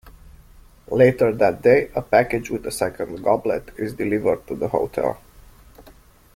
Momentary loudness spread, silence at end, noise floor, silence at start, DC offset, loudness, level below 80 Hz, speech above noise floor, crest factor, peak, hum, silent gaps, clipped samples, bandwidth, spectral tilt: 10 LU; 0.55 s; -49 dBFS; 0.05 s; under 0.1%; -21 LUFS; -48 dBFS; 29 dB; 18 dB; -2 dBFS; none; none; under 0.1%; 16 kHz; -6.5 dB/octave